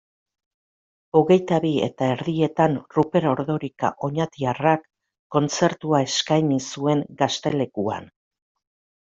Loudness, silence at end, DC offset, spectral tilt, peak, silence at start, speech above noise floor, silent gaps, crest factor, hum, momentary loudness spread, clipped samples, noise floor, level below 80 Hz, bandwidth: -22 LUFS; 1.05 s; under 0.1%; -5.5 dB/octave; -4 dBFS; 1.15 s; over 69 dB; 5.19-5.30 s; 20 dB; none; 7 LU; under 0.1%; under -90 dBFS; -62 dBFS; 7.8 kHz